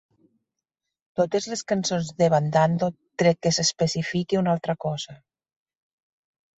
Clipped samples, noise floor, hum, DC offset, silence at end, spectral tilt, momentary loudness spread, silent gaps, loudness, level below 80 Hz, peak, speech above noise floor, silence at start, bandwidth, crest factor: under 0.1%; -85 dBFS; none; under 0.1%; 1.45 s; -5 dB/octave; 8 LU; none; -24 LUFS; -62 dBFS; -6 dBFS; 61 dB; 1.15 s; 8.2 kHz; 18 dB